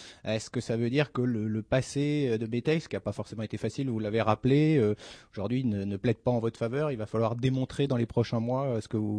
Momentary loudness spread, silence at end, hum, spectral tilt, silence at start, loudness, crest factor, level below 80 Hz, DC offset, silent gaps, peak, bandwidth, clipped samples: 8 LU; 0 s; none; -7 dB/octave; 0 s; -29 LUFS; 18 dB; -58 dBFS; under 0.1%; none; -10 dBFS; 10.5 kHz; under 0.1%